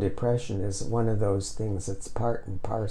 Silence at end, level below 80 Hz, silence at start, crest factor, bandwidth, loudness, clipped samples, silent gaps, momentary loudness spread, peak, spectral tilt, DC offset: 0 s; -42 dBFS; 0 s; 12 dB; 11.5 kHz; -30 LUFS; under 0.1%; none; 7 LU; -14 dBFS; -6.5 dB/octave; under 0.1%